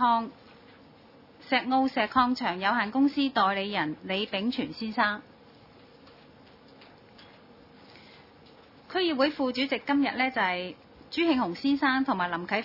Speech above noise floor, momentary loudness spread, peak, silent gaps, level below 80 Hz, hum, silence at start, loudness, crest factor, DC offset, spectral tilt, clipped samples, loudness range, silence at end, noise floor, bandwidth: 27 dB; 7 LU; -8 dBFS; none; -66 dBFS; none; 0 s; -27 LUFS; 20 dB; under 0.1%; -6 dB/octave; under 0.1%; 9 LU; 0 s; -54 dBFS; 5.8 kHz